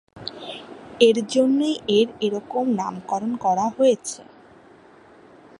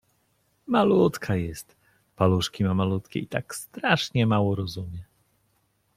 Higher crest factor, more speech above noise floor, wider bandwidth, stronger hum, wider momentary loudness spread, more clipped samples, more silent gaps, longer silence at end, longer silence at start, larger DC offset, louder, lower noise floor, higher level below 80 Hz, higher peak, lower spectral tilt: about the same, 22 dB vs 22 dB; second, 29 dB vs 45 dB; second, 11.5 kHz vs 15.5 kHz; neither; first, 18 LU vs 15 LU; neither; neither; first, 1.35 s vs 0.95 s; second, 0.15 s vs 0.7 s; neither; first, -21 LUFS vs -25 LUFS; second, -49 dBFS vs -69 dBFS; second, -66 dBFS vs -56 dBFS; about the same, -2 dBFS vs -4 dBFS; second, -4.5 dB/octave vs -6 dB/octave